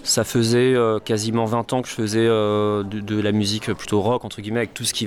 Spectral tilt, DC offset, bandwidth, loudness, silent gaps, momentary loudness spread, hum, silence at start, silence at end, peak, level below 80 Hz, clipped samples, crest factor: -4.5 dB/octave; under 0.1%; 17.5 kHz; -21 LUFS; none; 7 LU; none; 0 s; 0 s; -10 dBFS; -54 dBFS; under 0.1%; 12 dB